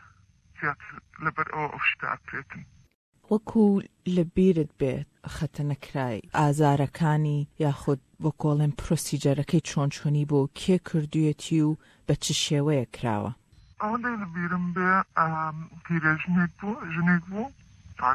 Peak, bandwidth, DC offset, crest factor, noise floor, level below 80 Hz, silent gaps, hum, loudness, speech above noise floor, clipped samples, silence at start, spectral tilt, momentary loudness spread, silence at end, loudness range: -10 dBFS; 14 kHz; under 0.1%; 18 dB; -58 dBFS; -52 dBFS; 2.95-3.13 s; none; -27 LUFS; 32 dB; under 0.1%; 0.6 s; -6 dB/octave; 11 LU; 0 s; 2 LU